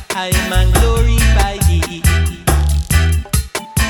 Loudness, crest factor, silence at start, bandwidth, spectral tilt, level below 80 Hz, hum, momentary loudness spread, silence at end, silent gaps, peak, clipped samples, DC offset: -15 LUFS; 14 dB; 0 s; 18.5 kHz; -4.5 dB/octave; -16 dBFS; none; 5 LU; 0 s; none; 0 dBFS; under 0.1%; under 0.1%